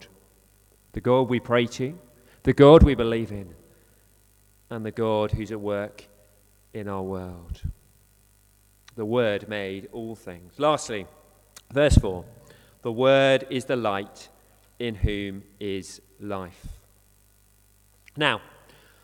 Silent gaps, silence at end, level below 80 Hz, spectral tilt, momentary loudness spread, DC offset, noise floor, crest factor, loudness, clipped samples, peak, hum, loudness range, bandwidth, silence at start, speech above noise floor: none; 0.65 s; -36 dBFS; -6.5 dB/octave; 21 LU; under 0.1%; -60 dBFS; 24 dB; -24 LUFS; under 0.1%; 0 dBFS; 50 Hz at -55 dBFS; 13 LU; 17 kHz; 0 s; 36 dB